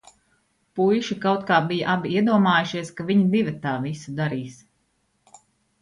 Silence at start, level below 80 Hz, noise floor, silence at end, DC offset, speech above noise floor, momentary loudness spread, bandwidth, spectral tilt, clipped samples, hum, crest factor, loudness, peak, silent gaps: 0.75 s; -64 dBFS; -69 dBFS; 1.25 s; under 0.1%; 47 dB; 11 LU; 11 kHz; -6.5 dB/octave; under 0.1%; none; 18 dB; -22 LUFS; -6 dBFS; none